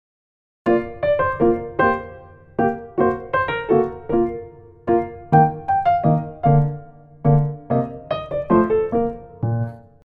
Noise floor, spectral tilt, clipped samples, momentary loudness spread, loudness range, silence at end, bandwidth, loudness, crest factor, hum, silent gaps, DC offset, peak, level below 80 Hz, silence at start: -41 dBFS; -10.5 dB/octave; under 0.1%; 9 LU; 2 LU; 0.25 s; 4.6 kHz; -20 LUFS; 18 dB; none; none; under 0.1%; -2 dBFS; -44 dBFS; 0.65 s